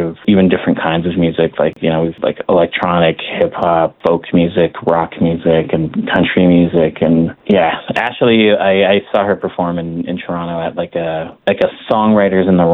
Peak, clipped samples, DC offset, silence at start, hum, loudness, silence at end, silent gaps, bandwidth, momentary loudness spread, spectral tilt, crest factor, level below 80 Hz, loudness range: 0 dBFS; under 0.1%; under 0.1%; 0 s; none; -14 LUFS; 0 s; none; 4.3 kHz; 8 LU; -9 dB/octave; 12 dB; -48 dBFS; 4 LU